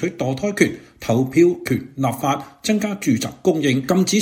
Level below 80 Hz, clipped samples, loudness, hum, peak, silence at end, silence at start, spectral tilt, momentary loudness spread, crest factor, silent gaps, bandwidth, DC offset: -54 dBFS; under 0.1%; -20 LUFS; none; -2 dBFS; 0 s; 0 s; -5.5 dB/octave; 7 LU; 18 dB; none; 17 kHz; under 0.1%